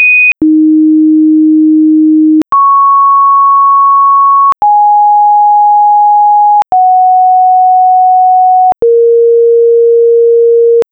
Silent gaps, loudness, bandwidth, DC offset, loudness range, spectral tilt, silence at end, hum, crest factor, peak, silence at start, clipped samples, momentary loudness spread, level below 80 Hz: none; -5 LUFS; 3.4 kHz; under 0.1%; 1 LU; -7.5 dB/octave; 0.1 s; none; 4 dB; -2 dBFS; 0 s; under 0.1%; 2 LU; -52 dBFS